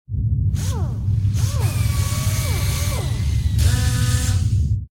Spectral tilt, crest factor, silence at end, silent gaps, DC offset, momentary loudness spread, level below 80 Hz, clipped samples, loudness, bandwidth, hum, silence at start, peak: -5 dB/octave; 14 dB; 0.05 s; none; under 0.1%; 4 LU; -26 dBFS; under 0.1%; -21 LUFS; 17.5 kHz; none; 0.1 s; -6 dBFS